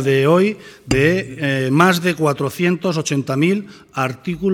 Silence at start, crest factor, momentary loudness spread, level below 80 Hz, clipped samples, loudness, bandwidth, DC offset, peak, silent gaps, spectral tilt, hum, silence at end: 0 s; 18 dB; 9 LU; -44 dBFS; under 0.1%; -17 LUFS; 17.5 kHz; under 0.1%; 0 dBFS; none; -6 dB/octave; none; 0 s